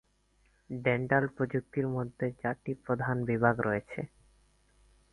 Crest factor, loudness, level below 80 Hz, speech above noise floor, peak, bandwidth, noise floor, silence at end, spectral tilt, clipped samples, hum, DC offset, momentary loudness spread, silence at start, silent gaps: 22 dB; -32 LUFS; -62 dBFS; 38 dB; -10 dBFS; 11 kHz; -69 dBFS; 1.05 s; -9 dB/octave; under 0.1%; 50 Hz at -60 dBFS; under 0.1%; 12 LU; 0.7 s; none